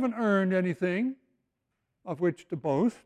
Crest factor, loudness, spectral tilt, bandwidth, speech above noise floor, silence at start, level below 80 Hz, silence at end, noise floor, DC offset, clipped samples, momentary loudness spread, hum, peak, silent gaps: 14 dB; -29 LUFS; -8 dB/octave; 9.8 kHz; 53 dB; 0 s; -72 dBFS; 0.1 s; -81 dBFS; under 0.1%; under 0.1%; 14 LU; none; -14 dBFS; none